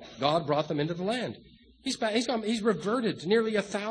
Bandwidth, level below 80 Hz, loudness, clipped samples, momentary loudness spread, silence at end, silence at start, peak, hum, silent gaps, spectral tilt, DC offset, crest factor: 10.5 kHz; -66 dBFS; -29 LUFS; under 0.1%; 8 LU; 0 s; 0 s; -10 dBFS; none; none; -5 dB/octave; under 0.1%; 20 dB